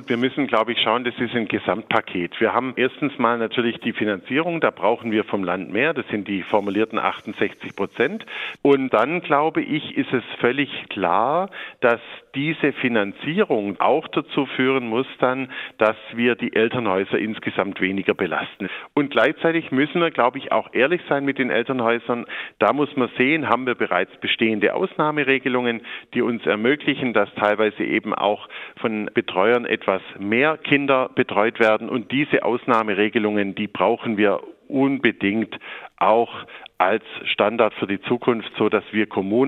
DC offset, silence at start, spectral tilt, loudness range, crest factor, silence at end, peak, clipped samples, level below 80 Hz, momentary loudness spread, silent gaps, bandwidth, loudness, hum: under 0.1%; 0 s; -7.5 dB/octave; 2 LU; 20 dB; 0 s; -2 dBFS; under 0.1%; -68 dBFS; 7 LU; none; 7.6 kHz; -21 LUFS; none